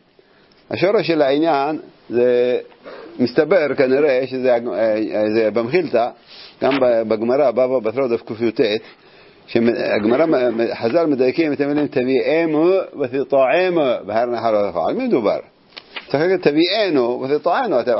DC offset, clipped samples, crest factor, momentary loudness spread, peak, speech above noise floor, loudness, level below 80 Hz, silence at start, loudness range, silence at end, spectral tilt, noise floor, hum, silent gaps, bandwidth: under 0.1%; under 0.1%; 16 dB; 7 LU; 0 dBFS; 36 dB; -18 LUFS; -62 dBFS; 0.7 s; 2 LU; 0 s; -9.5 dB/octave; -53 dBFS; none; none; 5.8 kHz